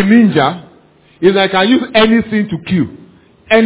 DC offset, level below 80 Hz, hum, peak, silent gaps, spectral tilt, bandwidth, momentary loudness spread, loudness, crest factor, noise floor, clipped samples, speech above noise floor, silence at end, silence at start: under 0.1%; -46 dBFS; none; 0 dBFS; none; -10 dB/octave; 4 kHz; 8 LU; -12 LUFS; 12 dB; -46 dBFS; under 0.1%; 35 dB; 0 s; 0 s